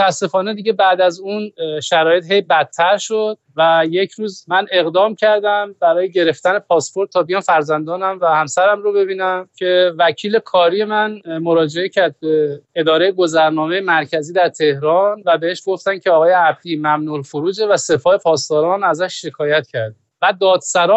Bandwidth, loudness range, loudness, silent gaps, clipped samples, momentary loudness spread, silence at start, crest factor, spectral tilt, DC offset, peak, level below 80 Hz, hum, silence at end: 8.6 kHz; 1 LU; -15 LUFS; none; under 0.1%; 7 LU; 0 s; 12 dB; -4 dB/octave; under 0.1%; -4 dBFS; -66 dBFS; none; 0 s